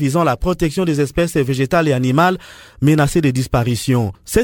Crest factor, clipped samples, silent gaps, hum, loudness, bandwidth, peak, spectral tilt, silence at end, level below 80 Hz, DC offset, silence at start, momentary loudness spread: 16 dB; under 0.1%; none; none; -17 LUFS; 18 kHz; 0 dBFS; -6 dB/octave; 0 s; -34 dBFS; under 0.1%; 0 s; 4 LU